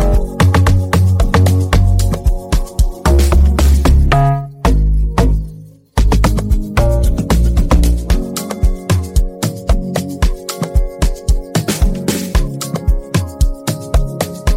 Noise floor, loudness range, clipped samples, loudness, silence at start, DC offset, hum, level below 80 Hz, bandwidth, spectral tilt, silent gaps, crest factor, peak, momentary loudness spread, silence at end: -34 dBFS; 5 LU; under 0.1%; -15 LUFS; 0 s; under 0.1%; none; -14 dBFS; 16.5 kHz; -6 dB/octave; none; 12 dB; -2 dBFS; 8 LU; 0 s